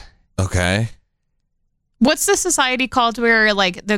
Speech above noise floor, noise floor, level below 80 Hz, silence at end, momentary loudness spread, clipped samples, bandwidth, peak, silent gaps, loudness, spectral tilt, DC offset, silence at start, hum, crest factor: 52 dB; -69 dBFS; -40 dBFS; 0 s; 9 LU; under 0.1%; 17 kHz; -4 dBFS; none; -16 LUFS; -3.5 dB/octave; under 0.1%; 0 s; none; 14 dB